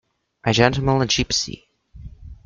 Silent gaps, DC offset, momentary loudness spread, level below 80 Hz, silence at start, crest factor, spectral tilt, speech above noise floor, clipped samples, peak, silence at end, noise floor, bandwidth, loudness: none; under 0.1%; 12 LU; -40 dBFS; 0.45 s; 20 dB; -4 dB/octave; 22 dB; under 0.1%; -2 dBFS; 0.1 s; -41 dBFS; 7.6 kHz; -19 LUFS